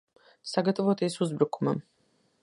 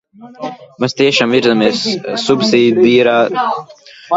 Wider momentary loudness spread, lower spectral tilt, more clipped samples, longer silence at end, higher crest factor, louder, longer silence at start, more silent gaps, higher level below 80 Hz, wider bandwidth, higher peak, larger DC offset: second, 7 LU vs 16 LU; first, -6.5 dB/octave vs -4.5 dB/octave; neither; first, 0.6 s vs 0 s; first, 20 dB vs 14 dB; second, -29 LUFS vs -12 LUFS; first, 0.45 s vs 0.2 s; neither; second, -76 dBFS vs -56 dBFS; first, 11.5 kHz vs 8 kHz; second, -8 dBFS vs 0 dBFS; neither